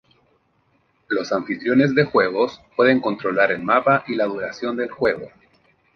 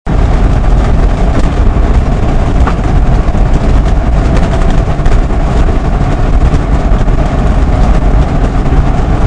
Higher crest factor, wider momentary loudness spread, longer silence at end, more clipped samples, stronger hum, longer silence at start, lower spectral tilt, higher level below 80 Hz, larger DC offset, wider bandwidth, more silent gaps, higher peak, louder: first, 20 dB vs 8 dB; first, 9 LU vs 2 LU; first, 0.7 s vs 0 s; second, under 0.1% vs 4%; neither; first, 1.1 s vs 0.05 s; about the same, -6.5 dB/octave vs -7.5 dB/octave; second, -60 dBFS vs -8 dBFS; neither; second, 6.6 kHz vs 9.2 kHz; neither; about the same, -2 dBFS vs 0 dBFS; second, -20 LUFS vs -11 LUFS